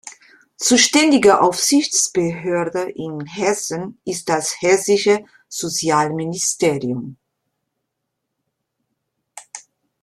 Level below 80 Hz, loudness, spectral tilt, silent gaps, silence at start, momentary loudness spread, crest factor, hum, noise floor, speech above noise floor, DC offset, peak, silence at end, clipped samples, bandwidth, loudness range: -60 dBFS; -17 LUFS; -3 dB/octave; none; 0.05 s; 16 LU; 20 dB; none; -77 dBFS; 60 dB; under 0.1%; 0 dBFS; 0.45 s; under 0.1%; 15 kHz; 9 LU